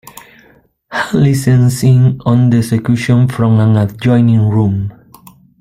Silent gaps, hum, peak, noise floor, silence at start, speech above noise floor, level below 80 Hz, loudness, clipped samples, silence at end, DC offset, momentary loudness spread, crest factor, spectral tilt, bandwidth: none; none; 0 dBFS; -49 dBFS; 0.9 s; 38 dB; -44 dBFS; -12 LUFS; under 0.1%; 0.7 s; under 0.1%; 6 LU; 10 dB; -7.5 dB/octave; 15 kHz